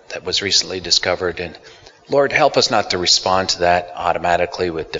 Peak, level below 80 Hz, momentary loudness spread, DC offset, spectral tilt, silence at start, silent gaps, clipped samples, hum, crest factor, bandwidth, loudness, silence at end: 0 dBFS; -50 dBFS; 8 LU; under 0.1%; -2 dB/octave; 0.1 s; none; under 0.1%; none; 18 dB; 7.8 kHz; -16 LUFS; 0 s